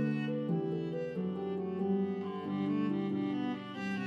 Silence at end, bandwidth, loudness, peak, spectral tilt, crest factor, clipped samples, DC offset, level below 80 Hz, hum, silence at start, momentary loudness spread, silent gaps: 0 s; 7 kHz; -35 LUFS; -22 dBFS; -8.5 dB/octave; 12 dB; under 0.1%; under 0.1%; -78 dBFS; none; 0 s; 5 LU; none